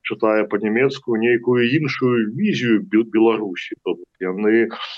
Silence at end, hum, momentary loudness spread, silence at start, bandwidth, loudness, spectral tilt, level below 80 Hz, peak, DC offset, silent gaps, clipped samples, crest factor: 0 s; none; 10 LU; 0.05 s; 7.2 kHz; -19 LUFS; -7 dB/octave; -68 dBFS; -6 dBFS; under 0.1%; none; under 0.1%; 12 dB